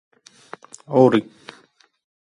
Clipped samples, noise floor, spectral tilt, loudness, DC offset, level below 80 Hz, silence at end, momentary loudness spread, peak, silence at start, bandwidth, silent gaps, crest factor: under 0.1%; -56 dBFS; -7 dB/octave; -17 LUFS; under 0.1%; -66 dBFS; 1.05 s; 26 LU; 0 dBFS; 0.9 s; 11 kHz; none; 22 dB